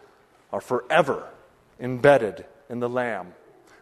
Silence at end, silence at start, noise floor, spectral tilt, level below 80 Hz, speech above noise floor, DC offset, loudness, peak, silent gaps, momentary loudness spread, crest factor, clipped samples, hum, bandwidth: 0.5 s; 0.5 s; -56 dBFS; -6 dB/octave; -62 dBFS; 33 dB; under 0.1%; -24 LUFS; -2 dBFS; none; 20 LU; 22 dB; under 0.1%; none; 13 kHz